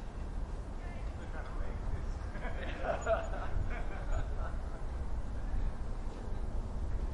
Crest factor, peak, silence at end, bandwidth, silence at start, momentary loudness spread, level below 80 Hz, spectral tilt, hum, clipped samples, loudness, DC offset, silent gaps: 16 dB; -20 dBFS; 0 s; 10.5 kHz; 0 s; 8 LU; -38 dBFS; -6.5 dB/octave; none; under 0.1%; -41 LUFS; under 0.1%; none